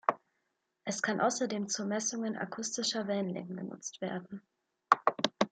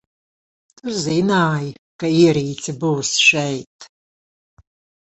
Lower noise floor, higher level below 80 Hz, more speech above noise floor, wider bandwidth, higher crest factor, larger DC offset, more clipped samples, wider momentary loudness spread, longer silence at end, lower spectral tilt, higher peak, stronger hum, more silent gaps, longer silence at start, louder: second, -82 dBFS vs under -90 dBFS; second, -80 dBFS vs -58 dBFS; second, 47 dB vs over 72 dB; first, 9.4 kHz vs 8.2 kHz; first, 28 dB vs 18 dB; neither; neither; about the same, 13 LU vs 13 LU; second, 0 s vs 1.25 s; about the same, -3 dB/octave vs -4 dB/octave; second, -6 dBFS vs -2 dBFS; neither; second, none vs 1.79-1.99 s, 3.67-3.79 s; second, 0.1 s vs 0.85 s; second, -33 LUFS vs -17 LUFS